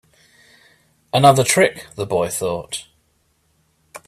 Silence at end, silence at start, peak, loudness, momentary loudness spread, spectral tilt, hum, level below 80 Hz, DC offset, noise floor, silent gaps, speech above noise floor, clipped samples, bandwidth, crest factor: 0.1 s; 1.15 s; 0 dBFS; -18 LUFS; 17 LU; -4 dB/octave; none; -56 dBFS; under 0.1%; -64 dBFS; none; 47 dB; under 0.1%; 16 kHz; 20 dB